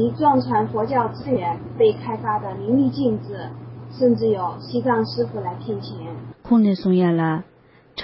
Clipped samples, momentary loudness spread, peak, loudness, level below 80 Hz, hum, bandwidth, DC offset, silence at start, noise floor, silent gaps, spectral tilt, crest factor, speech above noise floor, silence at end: under 0.1%; 15 LU; -6 dBFS; -21 LUFS; -54 dBFS; none; 5.8 kHz; under 0.1%; 0 s; -43 dBFS; none; -12 dB/octave; 16 dB; 23 dB; 0 s